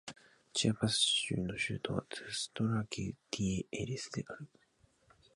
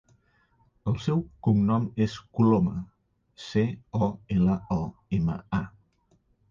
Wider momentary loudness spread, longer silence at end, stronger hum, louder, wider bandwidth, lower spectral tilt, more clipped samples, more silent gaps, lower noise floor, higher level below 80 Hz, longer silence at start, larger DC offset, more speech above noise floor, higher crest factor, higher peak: first, 13 LU vs 9 LU; about the same, 0.9 s vs 0.8 s; neither; second, -35 LUFS vs -27 LUFS; first, 11.5 kHz vs 7.4 kHz; second, -4 dB/octave vs -8.5 dB/octave; neither; neither; first, -71 dBFS vs -67 dBFS; second, -60 dBFS vs -48 dBFS; second, 0.05 s vs 0.85 s; neither; second, 35 dB vs 41 dB; about the same, 22 dB vs 18 dB; second, -16 dBFS vs -10 dBFS